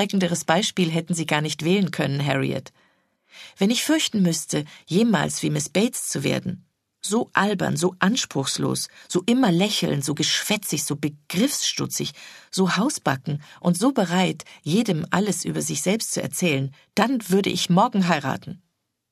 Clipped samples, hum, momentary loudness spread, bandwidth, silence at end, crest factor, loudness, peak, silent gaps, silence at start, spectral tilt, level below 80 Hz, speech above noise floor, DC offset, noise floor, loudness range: under 0.1%; none; 8 LU; 14 kHz; 0.55 s; 22 dB; -23 LUFS; 0 dBFS; none; 0 s; -4.5 dB/octave; -64 dBFS; 41 dB; under 0.1%; -64 dBFS; 2 LU